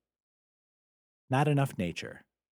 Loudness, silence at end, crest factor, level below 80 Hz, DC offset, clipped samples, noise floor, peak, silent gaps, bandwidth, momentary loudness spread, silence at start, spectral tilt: -31 LUFS; 0.35 s; 20 dB; -68 dBFS; under 0.1%; under 0.1%; under -90 dBFS; -14 dBFS; none; 16 kHz; 14 LU; 1.3 s; -6.5 dB/octave